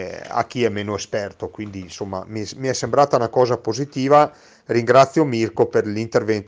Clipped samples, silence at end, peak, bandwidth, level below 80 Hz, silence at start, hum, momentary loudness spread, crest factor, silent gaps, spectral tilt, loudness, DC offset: under 0.1%; 0.05 s; 0 dBFS; 10 kHz; -58 dBFS; 0 s; none; 15 LU; 20 dB; none; -5.5 dB/octave; -19 LUFS; under 0.1%